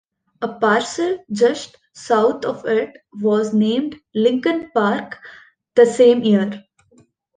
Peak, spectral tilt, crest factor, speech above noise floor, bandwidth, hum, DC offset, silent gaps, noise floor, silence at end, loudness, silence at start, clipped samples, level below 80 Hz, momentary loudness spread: -2 dBFS; -5.5 dB/octave; 16 dB; 38 dB; 9.6 kHz; none; under 0.1%; none; -55 dBFS; 0.8 s; -18 LUFS; 0.4 s; under 0.1%; -64 dBFS; 16 LU